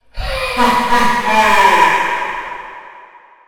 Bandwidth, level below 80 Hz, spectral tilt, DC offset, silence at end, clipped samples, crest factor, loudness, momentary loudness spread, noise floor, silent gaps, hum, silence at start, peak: 17.5 kHz; -32 dBFS; -3 dB/octave; under 0.1%; 0 s; under 0.1%; 14 dB; -13 LUFS; 16 LU; -41 dBFS; none; none; 0 s; 0 dBFS